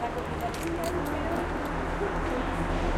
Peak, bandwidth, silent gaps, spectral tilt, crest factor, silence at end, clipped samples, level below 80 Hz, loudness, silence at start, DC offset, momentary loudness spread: -16 dBFS; 16.5 kHz; none; -6 dB/octave; 14 dB; 0 s; under 0.1%; -36 dBFS; -31 LUFS; 0 s; under 0.1%; 2 LU